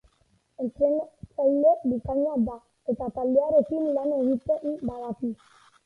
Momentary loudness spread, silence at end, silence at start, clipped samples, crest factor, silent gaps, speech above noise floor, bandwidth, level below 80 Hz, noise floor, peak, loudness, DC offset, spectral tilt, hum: 13 LU; 0.5 s; 0.6 s; under 0.1%; 16 dB; none; 42 dB; 4.2 kHz; -54 dBFS; -67 dBFS; -10 dBFS; -26 LUFS; under 0.1%; -10 dB/octave; none